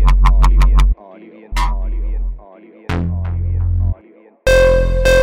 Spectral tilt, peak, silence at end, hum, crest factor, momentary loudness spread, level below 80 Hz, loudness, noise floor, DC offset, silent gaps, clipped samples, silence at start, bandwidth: -6 dB/octave; -4 dBFS; 0 s; none; 10 dB; 14 LU; -16 dBFS; -17 LUFS; -45 dBFS; under 0.1%; none; under 0.1%; 0 s; 11.5 kHz